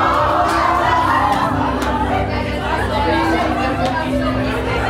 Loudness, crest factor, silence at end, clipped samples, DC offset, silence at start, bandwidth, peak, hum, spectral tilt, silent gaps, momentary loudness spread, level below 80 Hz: -17 LUFS; 12 dB; 0 s; under 0.1%; under 0.1%; 0 s; 16 kHz; -4 dBFS; none; -6 dB/octave; none; 5 LU; -28 dBFS